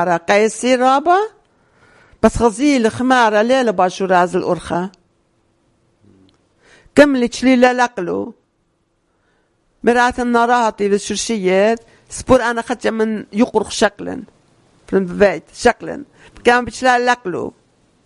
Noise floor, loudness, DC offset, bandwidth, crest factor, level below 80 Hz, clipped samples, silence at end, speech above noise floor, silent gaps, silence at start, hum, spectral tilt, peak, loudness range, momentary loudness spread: -64 dBFS; -15 LUFS; under 0.1%; 11.5 kHz; 16 dB; -42 dBFS; 0.1%; 0.55 s; 49 dB; none; 0 s; none; -4.5 dB/octave; 0 dBFS; 3 LU; 12 LU